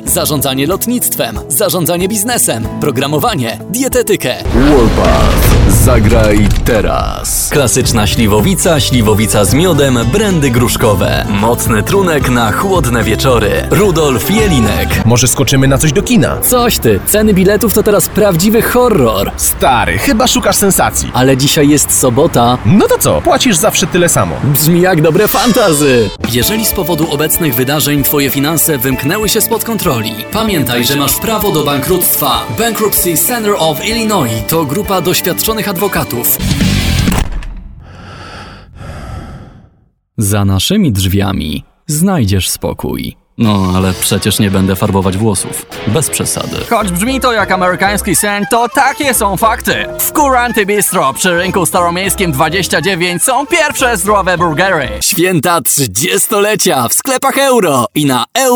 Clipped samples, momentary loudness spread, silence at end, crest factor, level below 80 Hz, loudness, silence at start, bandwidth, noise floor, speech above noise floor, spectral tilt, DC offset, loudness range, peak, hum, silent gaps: under 0.1%; 5 LU; 0 s; 10 dB; -24 dBFS; -10 LUFS; 0 s; over 20 kHz; -50 dBFS; 40 dB; -4 dB/octave; under 0.1%; 4 LU; 0 dBFS; none; none